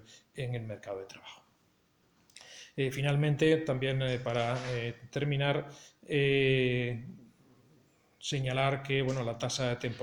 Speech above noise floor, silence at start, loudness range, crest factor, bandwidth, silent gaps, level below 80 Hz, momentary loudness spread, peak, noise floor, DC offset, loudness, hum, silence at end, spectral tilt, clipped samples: 39 dB; 0.1 s; 3 LU; 20 dB; 17 kHz; none; -60 dBFS; 20 LU; -14 dBFS; -70 dBFS; under 0.1%; -32 LUFS; none; 0 s; -5.5 dB/octave; under 0.1%